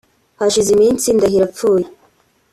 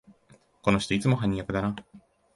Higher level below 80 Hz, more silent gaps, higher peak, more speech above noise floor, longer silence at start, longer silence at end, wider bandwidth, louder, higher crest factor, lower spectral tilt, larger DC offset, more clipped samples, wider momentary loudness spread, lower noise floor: about the same, -48 dBFS vs -50 dBFS; neither; first, -4 dBFS vs -8 dBFS; first, 42 dB vs 34 dB; first, 0.4 s vs 0.1 s; first, 0.65 s vs 0.4 s; first, 13.5 kHz vs 11.5 kHz; first, -14 LUFS vs -27 LUFS; second, 12 dB vs 20 dB; second, -4.5 dB/octave vs -6 dB/octave; neither; neither; about the same, 6 LU vs 7 LU; second, -56 dBFS vs -60 dBFS